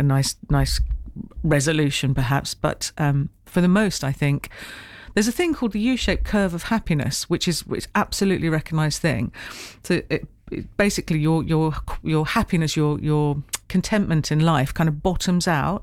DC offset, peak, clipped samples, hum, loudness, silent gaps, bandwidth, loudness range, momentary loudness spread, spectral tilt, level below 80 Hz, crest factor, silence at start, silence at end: under 0.1%; -8 dBFS; under 0.1%; none; -22 LUFS; none; 16 kHz; 2 LU; 8 LU; -5.5 dB/octave; -34 dBFS; 14 dB; 0 s; 0 s